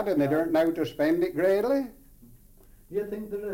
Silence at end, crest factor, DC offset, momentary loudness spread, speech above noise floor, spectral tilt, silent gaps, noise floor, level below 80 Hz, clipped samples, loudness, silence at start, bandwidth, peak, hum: 0 s; 14 dB; under 0.1%; 10 LU; 28 dB; -7 dB/octave; none; -54 dBFS; -56 dBFS; under 0.1%; -26 LUFS; 0 s; 17 kHz; -14 dBFS; none